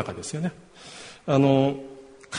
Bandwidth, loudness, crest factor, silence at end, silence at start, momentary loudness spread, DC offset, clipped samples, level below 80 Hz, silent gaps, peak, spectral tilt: 10.5 kHz; -24 LUFS; 20 dB; 0 s; 0 s; 24 LU; under 0.1%; under 0.1%; -60 dBFS; none; -6 dBFS; -6.5 dB/octave